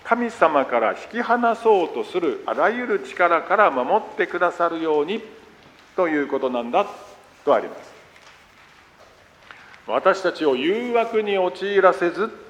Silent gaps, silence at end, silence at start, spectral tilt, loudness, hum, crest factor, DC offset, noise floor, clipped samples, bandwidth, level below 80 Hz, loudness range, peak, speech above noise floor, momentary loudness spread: none; 0 s; 0.05 s; -5 dB/octave; -21 LUFS; none; 20 dB; under 0.1%; -51 dBFS; under 0.1%; 11 kHz; -66 dBFS; 6 LU; -2 dBFS; 30 dB; 9 LU